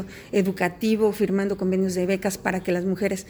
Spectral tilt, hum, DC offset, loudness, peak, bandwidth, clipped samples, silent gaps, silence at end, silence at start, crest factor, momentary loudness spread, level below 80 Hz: -6 dB/octave; none; under 0.1%; -24 LUFS; -6 dBFS; over 20 kHz; under 0.1%; none; 0 s; 0 s; 18 dB; 3 LU; -54 dBFS